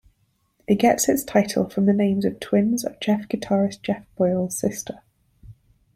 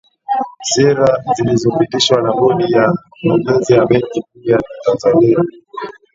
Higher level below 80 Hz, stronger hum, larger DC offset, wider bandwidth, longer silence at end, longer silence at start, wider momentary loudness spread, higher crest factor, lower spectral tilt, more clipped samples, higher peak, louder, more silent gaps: second, -56 dBFS vs -50 dBFS; neither; neither; first, 15.5 kHz vs 7.8 kHz; first, 0.45 s vs 0.25 s; first, 0.7 s vs 0.3 s; about the same, 10 LU vs 9 LU; about the same, 18 dB vs 14 dB; about the same, -5.5 dB/octave vs -5 dB/octave; neither; second, -4 dBFS vs 0 dBFS; second, -22 LUFS vs -14 LUFS; neither